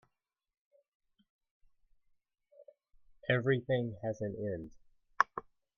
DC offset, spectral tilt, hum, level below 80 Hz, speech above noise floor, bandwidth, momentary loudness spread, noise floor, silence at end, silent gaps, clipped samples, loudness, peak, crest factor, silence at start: under 0.1%; -7 dB/octave; none; -68 dBFS; 49 dB; 6.8 kHz; 13 LU; -83 dBFS; 0.35 s; none; under 0.1%; -35 LUFS; -6 dBFS; 32 dB; 2.6 s